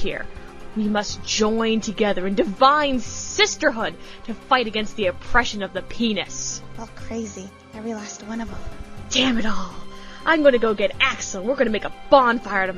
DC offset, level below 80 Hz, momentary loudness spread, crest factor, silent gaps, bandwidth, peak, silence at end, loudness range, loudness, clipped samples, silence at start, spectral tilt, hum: under 0.1%; -40 dBFS; 19 LU; 20 dB; none; 10.5 kHz; 0 dBFS; 0 s; 7 LU; -21 LUFS; under 0.1%; 0 s; -3 dB/octave; none